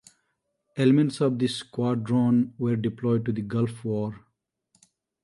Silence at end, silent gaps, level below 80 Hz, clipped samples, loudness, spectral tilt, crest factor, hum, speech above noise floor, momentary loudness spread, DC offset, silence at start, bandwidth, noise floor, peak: 1.05 s; none; -64 dBFS; under 0.1%; -25 LUFS; -7.5 dB/octave; 18 dB; none; 52 dB; 8 LU; under 0.1%; 0.75 s; 11.5 kHz; -77 dBFS; -8 dBFS